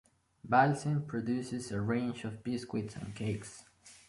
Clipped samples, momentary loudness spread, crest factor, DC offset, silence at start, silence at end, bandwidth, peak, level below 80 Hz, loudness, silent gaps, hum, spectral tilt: under 0.1%; 14 LU; 22 dB; under 0.1%; 0.45 s; 0.1 s; 11.5 kHz; -12 dBFS; -64 dBFS; -34 LUFS; none; none; -6.5 dB/octave